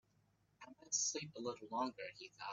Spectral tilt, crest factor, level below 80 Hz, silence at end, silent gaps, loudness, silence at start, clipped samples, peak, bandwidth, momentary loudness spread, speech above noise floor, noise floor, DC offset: -1.5 dB/octave; 20 dB; -86 dBFS; 0 s; none; -42 LUFS; 0.6 s; under 0.1%; -26 dBFS; 8.2 kHz; 22 LU; 33 dB; -77 dBFS; under 0.1%